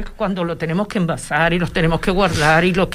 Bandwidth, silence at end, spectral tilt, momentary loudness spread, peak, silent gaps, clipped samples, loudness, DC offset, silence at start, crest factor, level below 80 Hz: 15 kHz; 0 s; -5.5 dB/octave; 8 LU; -2 dBFS; none; under 0.1%; -18 LUFS; under 0.1%; 0 s; 14 dB; -32 dBFS